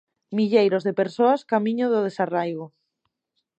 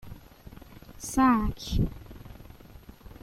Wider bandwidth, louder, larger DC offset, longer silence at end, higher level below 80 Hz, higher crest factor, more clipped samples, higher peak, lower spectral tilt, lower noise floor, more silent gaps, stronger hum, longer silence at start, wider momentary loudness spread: second, 8.4 kHz vs 16 kHz; first, -22 LUFS vs -27 LUFS; neither; first, 0.95 s vs 0.15 s; second, -76 dBFS vs -40 dBFS; about the same, 18 dB vs 18 dB; neither; first, -6 dBFS vs -12 dBFS; first, -7.5 dB/octave vs -5.5 dB/octave; first, -78 dBFS vs -49 dBFS; neither; neither; first, 0.3 s vs 0.05 s; second, 11 LU vs 27 LU